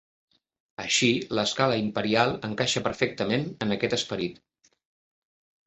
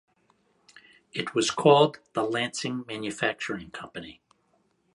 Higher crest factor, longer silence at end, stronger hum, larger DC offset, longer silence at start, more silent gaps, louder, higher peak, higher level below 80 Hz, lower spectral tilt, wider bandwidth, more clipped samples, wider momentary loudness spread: about the same, 22 dB vs 22 dB; first, 1.3 s vs 0.8 s; neither; neither; second, 0.8 s vs 1.15 s; neither; about the same, -26 LUFS vs -26 LUFS; about the same, -6 dBFS vs -6 dBFS; first, -60 dBFS vs -66 dBFS; about the same, -4 dB/octave vs -4 dB/octave; second, 8.4 kHz vs 11.5 kHz; neither; second, 8 LU vs 19 LU